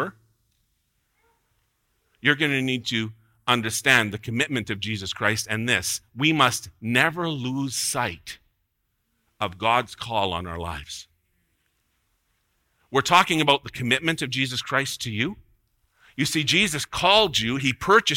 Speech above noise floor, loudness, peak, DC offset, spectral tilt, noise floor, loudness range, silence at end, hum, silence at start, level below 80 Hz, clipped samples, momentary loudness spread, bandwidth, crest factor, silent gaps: 51 dB; -23 LUFS; -4 dBFS; under 0.1%; -3.5 dB/octave; -74 dBFS; 6 LU; 0 s; none; 0 s; -54 dBFS; under 0.1%; 13 LU; 17 kHz; 22 dB; none